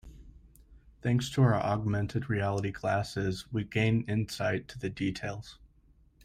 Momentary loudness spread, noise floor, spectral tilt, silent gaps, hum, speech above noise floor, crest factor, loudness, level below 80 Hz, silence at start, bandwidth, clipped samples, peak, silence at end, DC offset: 11 LU; -62 dBFS; -6.5 dB/octave; none; none; 32 dB; 18 dB; -31 LUFS; -54 dBFS; 0.05 s; 14.5 kHz; under 0.1%; -14 dBFS; 0.7 s; under 0.1%